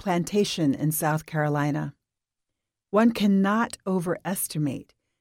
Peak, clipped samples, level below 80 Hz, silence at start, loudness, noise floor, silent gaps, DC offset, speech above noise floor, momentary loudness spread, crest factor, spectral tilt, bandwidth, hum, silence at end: -8 dBFS; under 0.1%; -62 dBFS; 0.05 s; -25 LUFS; -85 dBFS; none; under 0.1%; 60 dB; 8 LU; 16 dB; -5.5 dB/octave; 17 kHz; none; 0.4 s